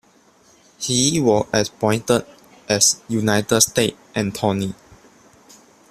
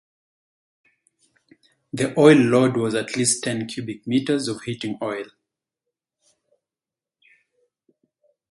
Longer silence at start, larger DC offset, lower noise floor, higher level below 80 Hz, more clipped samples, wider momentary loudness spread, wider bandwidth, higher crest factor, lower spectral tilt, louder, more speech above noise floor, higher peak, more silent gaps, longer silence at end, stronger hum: second, 0.8 s vs 1.95 s; neither; second, -54 dBFS vs under -90 dBFS; first, -54 dBFS vs -66 dBFS; neither; second, 10 LU vs 16 LU; first, 15.5 kHz vs 11.5 kHz; about the same, 22 dB vs 24 dB; about the same, -3.5 dB/octave vs -4.5 dB/octave; about the same, -19 LUFS vs -21 LUFS; second, 35 dB vs over 70 dB; about the same, 0 dBFS vs 0 dBFS; neither; second, 1.2 s vs 3.25 s; neither